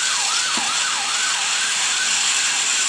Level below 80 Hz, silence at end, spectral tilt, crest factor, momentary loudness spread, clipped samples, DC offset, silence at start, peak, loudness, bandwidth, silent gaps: -82 dBFS; 0 s; 3 dB/octave; 12 dB; 2 LU; under 0.1%; under 0.1%; 0 s; -8 dBFS; -17 LUFS; 10.5 kHz; none